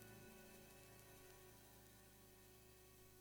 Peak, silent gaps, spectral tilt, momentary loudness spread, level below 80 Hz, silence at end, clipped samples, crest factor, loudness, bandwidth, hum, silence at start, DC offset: -38 dBFS; none; -3.5 dB/octave; 4 LU; -76 dBFS; 0 s; under 0.1%; 26 dB; -64 LUFS; over 20 kHz; none; 0 s; under 0.1%